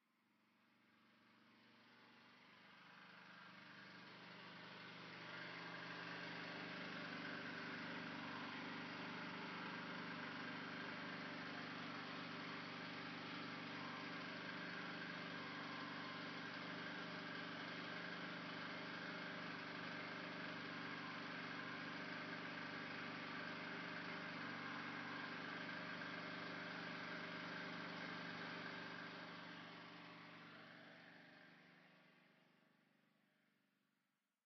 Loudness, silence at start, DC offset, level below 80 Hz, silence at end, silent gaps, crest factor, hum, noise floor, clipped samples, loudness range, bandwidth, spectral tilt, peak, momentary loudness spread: -50 LUFS; 0.6 s; under 0.1%; under -90 dBFS; 1.95 s; none; 16 dB; none; -90 dBFS; under 0.1%; 12 LU; 6.2 kHz; -2 dB/octave; -38 dBFS; 11 LU